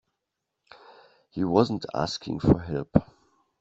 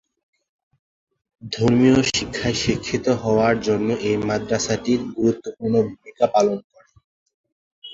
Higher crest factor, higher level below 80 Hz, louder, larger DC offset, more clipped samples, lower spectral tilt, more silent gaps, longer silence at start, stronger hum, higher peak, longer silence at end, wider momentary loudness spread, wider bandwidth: first, 24 dB vs 18 dB; about the same, -48 dBFS vs -48 dBFS; second, -26 LUFS vs -20 LUFS; neither; neither; first, -7 dB/octave vs -5 dB/octave; second, none vs 6.64-6.70 s, 7.04-7.26 s, 7.34-7.44 s, 7.52-7.82 s; about the same, 1.35 s vs 1.45 s; neither; about the same, -4 dBFS vs -4 dBFS; first, 0.6 s vs 0 s; about the same, 7 LU vs 7 LU; about the same, 8 kHz vs 8 kHz